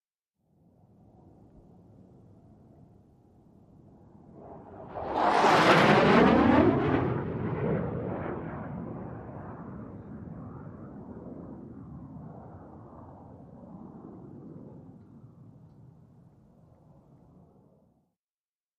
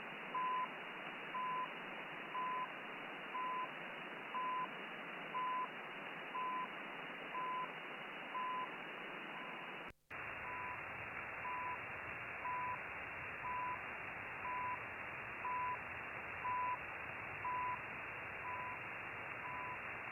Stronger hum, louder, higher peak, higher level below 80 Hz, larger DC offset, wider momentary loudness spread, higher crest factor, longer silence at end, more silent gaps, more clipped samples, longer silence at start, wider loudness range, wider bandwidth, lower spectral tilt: neither; first, -25 LUFS vs -44 LUFS; first, -6 dBFS vs -30 dBFS; first, -54 dBFS vs -74 dBFS; neither; first, 28 LU vs 6 LU; first, 26 dB vs 14 dB; first, 3.5 s vs 0 s; neither; neither; first, 4.35 s vs 0 s; first, 25 LU vs 3 LU; second, 13 kHz vs 16 kHz; first, -6.5 dB/octave vs -5 dB/octave